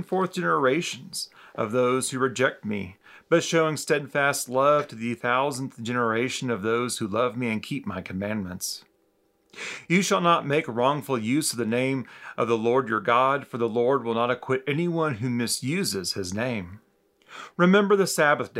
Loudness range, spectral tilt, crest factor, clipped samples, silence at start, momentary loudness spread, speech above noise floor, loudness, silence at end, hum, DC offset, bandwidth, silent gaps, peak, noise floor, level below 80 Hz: 4 LU; -4.5 dB/octave; 18 dB; under 0.1%; 0 s; 11 LU; 42 dB; -25 LUFS; 0 s; none; under 0.1%; 16 kHz; none; -6 dBFS; -67 dBFS; -72 dBFS